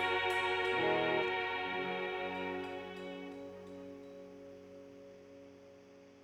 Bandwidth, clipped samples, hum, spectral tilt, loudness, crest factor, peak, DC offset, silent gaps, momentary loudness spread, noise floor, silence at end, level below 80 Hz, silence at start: 15.5 kHz; under 0.1%; none; -4.5 dB/octave; -36 LUFS; 18 dB; -22 dBFS; under 0.1%; none; 23 LU; -58 dBFS; 0 s; -74 dBFS; 0 s